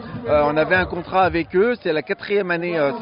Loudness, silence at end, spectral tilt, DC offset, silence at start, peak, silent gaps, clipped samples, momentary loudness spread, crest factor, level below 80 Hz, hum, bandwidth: -20 LUFS; 0 s; -4 dB/octave; under 0.1%; 0 s; -6 dBFS; none; under 0.1%; 5 LU; 14 dB; -44 dBFS; none; 5.4 kHz